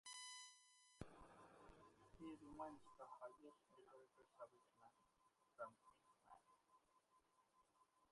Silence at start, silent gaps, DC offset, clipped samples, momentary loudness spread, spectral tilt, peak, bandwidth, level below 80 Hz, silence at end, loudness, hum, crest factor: 0.05 s; none; under 0.1%; under 0.1%; 12 LU; -3 dB/octave; -38 dBFS; 11.5 kHz; -82 dBFS; 0 s; -61 LUFS; none; 26 dB